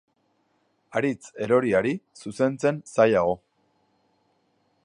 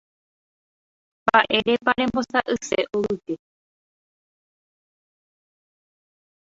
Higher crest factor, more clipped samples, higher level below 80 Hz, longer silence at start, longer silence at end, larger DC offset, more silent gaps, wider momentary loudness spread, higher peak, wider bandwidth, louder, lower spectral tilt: about the same, 22 dB vs 24 dB; neither; about the same, -62 dBFS vs -58 dBFS; second, 0.95 s vs 1.25 s; second, 1.5 s vs 3.2 s; neither; neither; about the same, 13 LU vs 11 LU; second, -6 dBFS vs -2 dBFS; first, 10.5 kHz vs 8 kHz; about the same, -24 LUFS vs -22 LUFS; first, -6.5 dB/octave vs -3.5 dB/octave